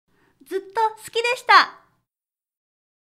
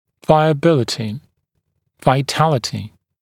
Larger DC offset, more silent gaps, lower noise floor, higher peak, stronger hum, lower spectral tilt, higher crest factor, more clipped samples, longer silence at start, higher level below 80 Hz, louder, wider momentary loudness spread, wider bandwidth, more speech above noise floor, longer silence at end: neither; neither; first, under -90 dBFS vs -70 dBFS; about the same, 0 dBFS vs 0 dBFS; neither; second, -0.5 dB/octave vs -6 dB/octave; about the same, 22 dB vs 18 dB; neither; first, 0.5 s vs 0.3 s; second, -74 dBFS vs -52 dBFS; about the same, -19 LUFS vs -17 LUFS; about the same, 15 LU vs 15 LU; about the same, 15.5 kHz vs 15.5 kHz; first, over 70 dB vs 54 dB; first, 1.35 s vs 0.35 s